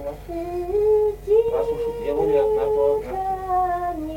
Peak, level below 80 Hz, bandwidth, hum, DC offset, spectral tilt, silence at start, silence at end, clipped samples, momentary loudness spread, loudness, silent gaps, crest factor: -8 dBFS; -40 dBFS; 16.5 kHz; none; under 0.1%; -7 dB/octave; 0 s; 0 s; under 0.1%; 8 LU; -22 LUFS; none; 14 dB